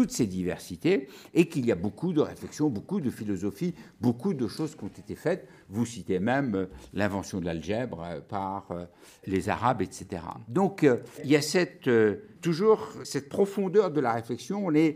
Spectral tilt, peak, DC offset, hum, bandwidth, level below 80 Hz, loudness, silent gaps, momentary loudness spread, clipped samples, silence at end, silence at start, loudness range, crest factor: -6 dB/octave; -8 dBFS; under 0.1%; none; 15.5 kHz; -60 dBFS; -29 LUFS; none; 11 LU; under 0.1%; 0 s; 0 s; 6 LU; 20 dB